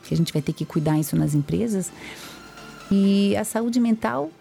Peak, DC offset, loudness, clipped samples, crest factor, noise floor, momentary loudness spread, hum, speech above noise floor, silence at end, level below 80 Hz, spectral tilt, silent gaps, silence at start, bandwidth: -12 dBFS; under 0.1%; -23 LUFS; under 0.1%; 12 dB; -41 dBFS; 19 LU; none; 19 dB; 0.1 s; -52 dBFS; -6.5 dB/octave; none; 0.05 s; 17 kHz